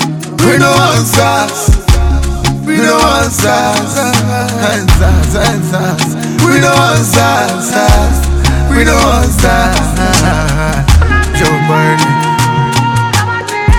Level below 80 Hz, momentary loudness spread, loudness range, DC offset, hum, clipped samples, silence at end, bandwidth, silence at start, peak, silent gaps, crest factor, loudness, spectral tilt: -16 dBFS; 5 LU; 1 LU; 0.3%; none; 0.3%; 0 s; 18 kHz; 0 s; 0 dBFS; none; 8 dB; -10 LUFS; -4.5 dB/octave